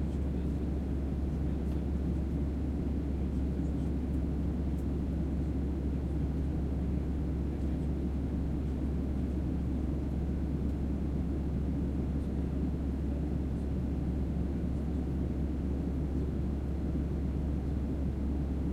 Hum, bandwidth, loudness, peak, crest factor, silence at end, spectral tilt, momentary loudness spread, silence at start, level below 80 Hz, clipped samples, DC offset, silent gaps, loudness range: none; 4.9 kHz; -34 LUFS; -20 dBFS; 12 dB; 0 s; -9.5 dB/octave; 1 LU; 0 s; -36 dBFS; under 0.1%; under 0.1%; none; 0 LU